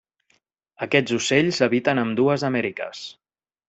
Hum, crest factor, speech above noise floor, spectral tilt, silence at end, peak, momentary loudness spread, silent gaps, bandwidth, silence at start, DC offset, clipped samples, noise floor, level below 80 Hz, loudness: none; 20 dB; 46 dB; -5 dB/octave; 0.55 s; -4 dBFS; 14 LU; none; 8.2 kHz; 0.8 s; under 0.1%; under 0.1%; -67 dBFS; -64 dBFS; -21 LUFS